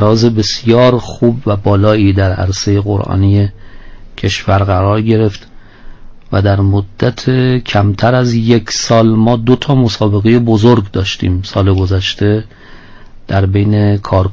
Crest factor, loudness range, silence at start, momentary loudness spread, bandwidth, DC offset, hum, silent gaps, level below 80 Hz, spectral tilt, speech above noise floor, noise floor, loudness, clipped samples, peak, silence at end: 12 dB; 3 LU; 0 s; 6 LU; 7.6 kHz; under 0.1%; none; none; -28 dBFS; -6.5 dB/octave; 23 dB; -33 dBFS; -12 LUFS; under 0.1%; 0 dBFS; 0 s